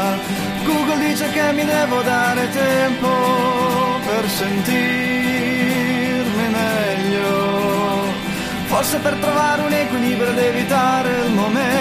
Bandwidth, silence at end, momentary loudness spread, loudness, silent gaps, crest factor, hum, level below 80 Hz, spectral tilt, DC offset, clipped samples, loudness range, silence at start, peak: 15.5 kHz; 0 s; 3 LU; -18 LUFS; none; 14 dB; none; -48 dBFS; -4.5 dB/octave; under 0.1%; under 0.1%; 1 LU; 0 s; -4 dBFS